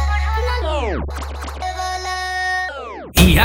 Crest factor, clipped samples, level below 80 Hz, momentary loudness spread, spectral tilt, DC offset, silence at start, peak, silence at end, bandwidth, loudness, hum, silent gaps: 18 dB; under 0.1%; -24 dBFS; 10 LU; -4.5 dB/octave; under 0.1%; 0 s; 0 dBFS; 0 s; over 20 kHz; -21 LUFS; none; none